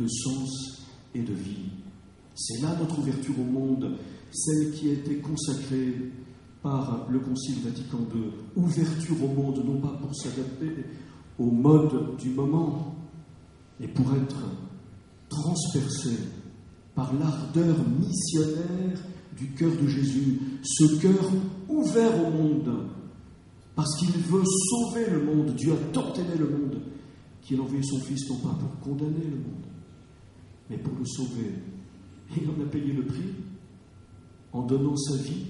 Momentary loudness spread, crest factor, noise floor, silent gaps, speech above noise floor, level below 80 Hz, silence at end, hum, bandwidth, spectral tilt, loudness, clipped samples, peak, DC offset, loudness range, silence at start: 17 LU; 22 dB; -51 dBFS; none; 24 dB; -58 dBFS; 0 s; none; 11.5 kHz; -6 dB/octave; -28 LUFS; under 0.1%; -6 dBFS; under 0.1%; 8 LU; 0 s